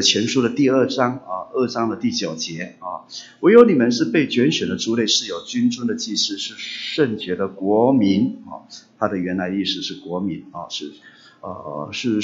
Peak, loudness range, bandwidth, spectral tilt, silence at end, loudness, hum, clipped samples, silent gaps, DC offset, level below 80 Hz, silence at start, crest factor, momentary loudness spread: 0 dBFS; 8 LU; 7.8 kHz; -4.5 dB/octave; 0 s; -20 LUFS; none; under 0.1%; none; under 0.1%; -64 dBFS; 0 s; 20 dB; 15 LU